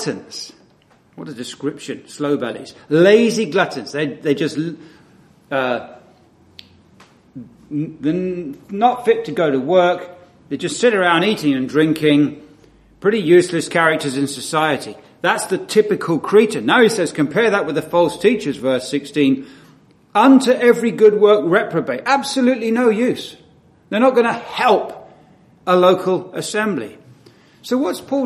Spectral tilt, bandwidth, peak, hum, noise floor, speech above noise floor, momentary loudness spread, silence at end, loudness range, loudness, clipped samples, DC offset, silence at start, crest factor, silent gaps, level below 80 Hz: -5 dB/octave; 14 kHz; 0 dBFS; none; -53 dBFS; 37 dB; 14 LU; 0 s; 8 LU; -17 LUFS; under 0.1%; under 0.1%; 0 s; 18 dB; none; -60 dBFS